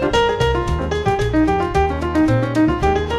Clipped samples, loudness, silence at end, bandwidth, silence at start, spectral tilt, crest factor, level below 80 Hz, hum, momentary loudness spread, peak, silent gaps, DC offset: under 0.1%; -18 LUFS; 0 s; 12.5 kHz; 0 s; -6.5 dB/octave; 14 dB; -28 dBFS; none; 3 LU; -4 dBFS; none; under 0.1%